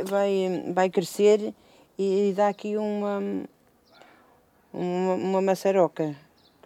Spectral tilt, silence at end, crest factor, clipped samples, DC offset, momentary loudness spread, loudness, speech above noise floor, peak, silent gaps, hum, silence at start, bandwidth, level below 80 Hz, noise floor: -6 dB/octave; 0.5 s; 18 dB; under 0.1%; under 0.1%; 13 LU; -25 LUFS; 36 dB; -8 dBFS; none; none; 0 s; 15.5 kHz; -74 dBFS; -60 dBFS